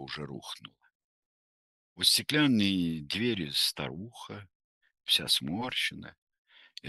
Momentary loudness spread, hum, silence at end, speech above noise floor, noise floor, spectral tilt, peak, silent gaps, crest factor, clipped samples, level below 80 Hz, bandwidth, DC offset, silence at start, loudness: 20 LU; none; 0 s; over 59 dB; under -90 dBFS; -3 dB/octave; -10 dBFS; 0.95-1.96 s, 4.55-4.81 s, 6.18-6.27 s, 6.39-6.45 s; 22 dB; under 0.1%; -66 dBFS; 12.5 kHz; under 0.1%; 0 s; -28 LUFS